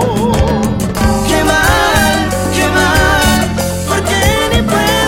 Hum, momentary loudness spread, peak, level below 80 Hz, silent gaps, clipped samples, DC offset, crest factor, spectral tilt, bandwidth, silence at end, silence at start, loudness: none; 5 LU; 0 dBFS; -22 dBFS; none; under 0.1%; under 0.1%; 12 dB; -4 dB/octave; 17 kHz; 0 s; 0 s; -11 LUFS